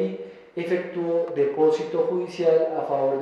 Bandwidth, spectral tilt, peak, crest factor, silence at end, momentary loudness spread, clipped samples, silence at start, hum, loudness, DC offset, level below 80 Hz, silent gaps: 7.8 kHz; -7 dB/octave; -10 dBFS; 14 dB; 0 s; 10 LU; under 0.1%; 0 s; none; -24 LUFS; under 0.1%; -74 dBFS; none